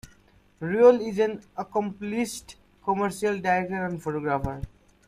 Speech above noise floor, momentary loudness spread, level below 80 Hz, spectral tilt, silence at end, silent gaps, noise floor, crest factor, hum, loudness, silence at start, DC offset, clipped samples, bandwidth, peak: 34 dB; 17 LU; -50 dBFS; -6 dB/octave; 0.4 s; none; -58 dBFS; 20 dB; none; -26 LUFS; 0.6 s; under 0.1%; under 0.1%; 14.5 kHz; -6 dBFS